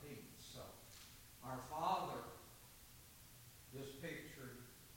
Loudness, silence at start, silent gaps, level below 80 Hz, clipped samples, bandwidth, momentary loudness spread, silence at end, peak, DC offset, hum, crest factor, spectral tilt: -49 LUFS; 0 s; none; -70 dBFS; under 0.1%; 17 kHz; 18 LU; 0 s; -28 dBFS; under 0.1%; none; 22 dB; -4 dB/octave